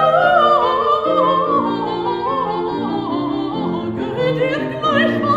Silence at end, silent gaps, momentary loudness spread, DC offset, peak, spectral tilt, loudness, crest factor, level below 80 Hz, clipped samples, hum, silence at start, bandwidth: 0 s; none; 9 LU; under 0.1%; -2 dBFS; -7 dB/octave; -17 LUFS; 16 dB; -50 dBFS; under 0.1%; none; 0 s; 11 kHz